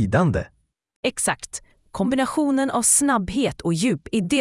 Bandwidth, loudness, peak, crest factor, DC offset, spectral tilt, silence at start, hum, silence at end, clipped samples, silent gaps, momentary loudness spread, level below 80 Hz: 12 kHz; -21 LUFS; -4 dBFS; 18 dB; under 0.1%; -4 dB/octave; 0 s; none; 0 s; under 0.1%; 0.96-1.03 s; 14 LU; -46 dBFS